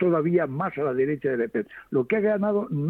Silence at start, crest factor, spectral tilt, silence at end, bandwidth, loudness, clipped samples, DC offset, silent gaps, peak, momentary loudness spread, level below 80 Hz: 0 s; 14 dB; -10.5 dB/octave; 0 s; 4.2 kHz; -25 LUFS; under 0.1%; under 0.1%; none; -10 dBFS; 6 LU; -64 dBFS